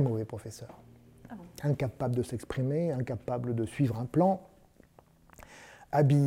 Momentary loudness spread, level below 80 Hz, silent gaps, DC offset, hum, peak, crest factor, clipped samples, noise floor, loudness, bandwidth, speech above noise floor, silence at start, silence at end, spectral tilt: 22 LU; -60 dBFS; none; under 0.1%; none; -14 dBFS; 18 dB; under 0.1%; -60 dBFS; -31 LUFS; 14.5 kHz; 31 dB; 0 s; 0 s; -8.5 dB/octave